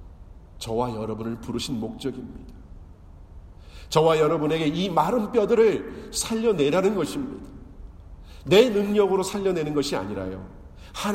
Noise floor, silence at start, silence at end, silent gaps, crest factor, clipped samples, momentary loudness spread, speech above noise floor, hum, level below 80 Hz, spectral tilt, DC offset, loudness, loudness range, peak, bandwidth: -45 dBFS; 0 s; 0 s; none; 20 dB; under 0.1%; 20 LU; 22 dB; none; -46 dBFS; -5 dB/octave; under 0.1%; -24 LUFS; 10 LU; -4 dBFS; 16 kHz